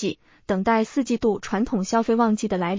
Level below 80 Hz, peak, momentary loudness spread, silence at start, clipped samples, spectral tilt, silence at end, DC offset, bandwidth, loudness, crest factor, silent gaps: -52 dBFS; -8 dBFS; 6 LU; 0 s; under 0.1%; -6 dB/octave; 0 s; under 0.1%; 7.6 kHz; -23 LUFS; 14 dB; none